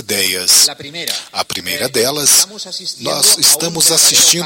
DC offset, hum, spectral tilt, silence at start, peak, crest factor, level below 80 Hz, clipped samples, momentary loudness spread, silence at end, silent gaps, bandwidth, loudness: under 0.1%; none; 0 dB/octave; 0 s; 0 dBFS; 14 dB; -56 dBFS; under 0.1%; 13 LU; 0 s; none; 17 kHz; -11 LUFS